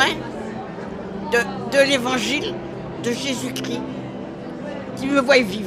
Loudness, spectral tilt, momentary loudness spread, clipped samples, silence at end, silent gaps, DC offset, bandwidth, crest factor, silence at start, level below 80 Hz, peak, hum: -22 LUFS; -4 dB/octave; 15 LU; under 0.1%; 0 s; none; under 0.1%; 15.5 kHz; 20 dB; 0 s; -50 dBFS; -2 dBFS; none